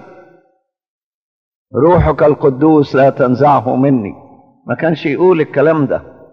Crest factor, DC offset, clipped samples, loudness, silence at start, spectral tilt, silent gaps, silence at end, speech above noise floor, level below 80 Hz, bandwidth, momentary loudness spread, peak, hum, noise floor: 14 dB; under 0.1%; under 0.1%; -12 LUFS; 1.75 s; -9.5 dB/octave; none; 0.3 s; 49 dB; -34 dBFS; 6.4 kHz; 8 LU; 0 dBFS; none; -60 dBFS